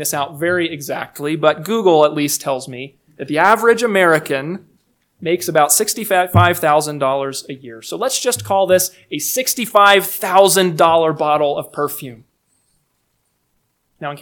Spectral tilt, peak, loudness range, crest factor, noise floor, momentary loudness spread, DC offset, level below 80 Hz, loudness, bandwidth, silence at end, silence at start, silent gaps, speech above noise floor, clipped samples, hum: -3.5 dB/octave; 0 dBFS; 4 LU; 16 dB; -67 dBFS; 17 LU; under 0.1%; -56 dBFS; -15 LUFS; 19.5 kHz; 0 s; 0 s; none; 51 dB; under 0.1%; none